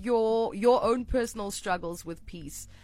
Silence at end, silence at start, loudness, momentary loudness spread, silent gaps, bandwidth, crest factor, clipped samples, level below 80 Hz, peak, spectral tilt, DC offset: 0.05 s; 0 s; -28 LUFS; 17 LU; none; 16 kHz; 18 dB; under 0.1%; -46 dBFS; -10 dBFS; -4.5 dB/octave; under 0.1%